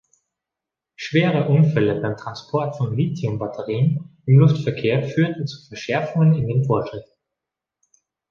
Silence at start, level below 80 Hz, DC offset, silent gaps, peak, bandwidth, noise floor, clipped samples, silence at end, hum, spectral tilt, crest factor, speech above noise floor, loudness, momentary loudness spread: 1 s; -56 dBFS; under 0.1%; none; -4 dBFS; 7 kHz; -86 dBFS; under 0.1%; 1.3 s; none; -8 dB/octave; 18 dB; 67 dB; -20 LUFS; 13 LU